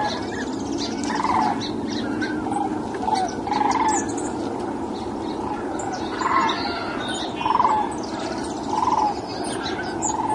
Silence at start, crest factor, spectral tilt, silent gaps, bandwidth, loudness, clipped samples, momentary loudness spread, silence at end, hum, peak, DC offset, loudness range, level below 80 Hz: 0 s; 18 dB; -4 dB/octave; none; 11.5 kHz; -24 LUFS; under 0.1%; 7 LU; 0 s; none; -6 dBFS; under 0.1%; 2 LU; -50 dBFS